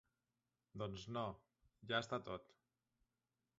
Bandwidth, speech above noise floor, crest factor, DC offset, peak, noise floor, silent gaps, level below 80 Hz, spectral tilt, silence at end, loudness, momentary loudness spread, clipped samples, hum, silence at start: 7.6 kHz; over 44 dB; 26 dB; under 0.1%; -24 dBFS; under -90 dBFS; none; -74 dBFS; -3 dB/octave; 1.15 s; -46 LUFS; 19 LU; under 0.1%; none; 0.75 s